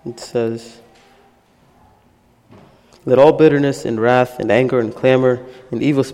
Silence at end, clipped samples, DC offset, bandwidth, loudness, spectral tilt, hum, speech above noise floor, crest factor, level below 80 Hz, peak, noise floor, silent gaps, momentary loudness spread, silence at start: 0 s; under 0.1%; under 0.1%; 13.5 kHz; -15 LUFS; -7 dB/octave; none; 39 dB; 16 dB; -54 dBFS; 0 dBFS; -54 dBFS; none; 13 LU; 0.05 s